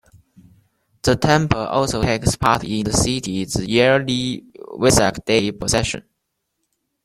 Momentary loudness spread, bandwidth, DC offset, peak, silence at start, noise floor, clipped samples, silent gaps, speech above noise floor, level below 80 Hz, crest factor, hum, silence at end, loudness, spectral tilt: 8 LU; 16 kHz; under 0.1%; -2 dBFS; 1.05 s; -75 dBFS; under 0.1%; none; 57 dB; -38 dBFS; 18 dB; none; 1.05 s; -18 LUFS; -4.5 dB/octave